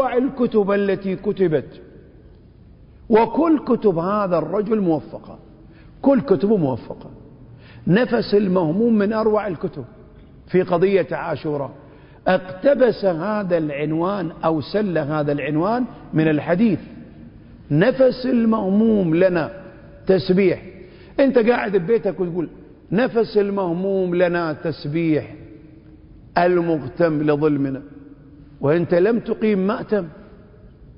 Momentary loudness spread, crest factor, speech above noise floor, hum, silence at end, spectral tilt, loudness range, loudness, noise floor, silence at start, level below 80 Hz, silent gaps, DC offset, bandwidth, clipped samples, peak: 11 LU; 20 dB; 27 dB; none; 0.15 s; -12 dB/octave; 3 LU; -20 LUFS; -46 dBFS; 0 s; -50 dBFS; none; under 0.1%; 5.4 kHz; under 0.1%; 0 dBFS